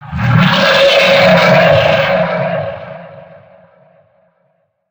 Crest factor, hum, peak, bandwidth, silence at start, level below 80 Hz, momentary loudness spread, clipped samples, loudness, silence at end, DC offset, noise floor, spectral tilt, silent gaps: 12 dB; none; 0 dBFS; over 20 kHz; 0 s; -40 dBFS; 17 LU; under 0.1%; -9 LUFS; 1.7 s; under 0.1%; -60 dBFS; -5.5 dB/octave; none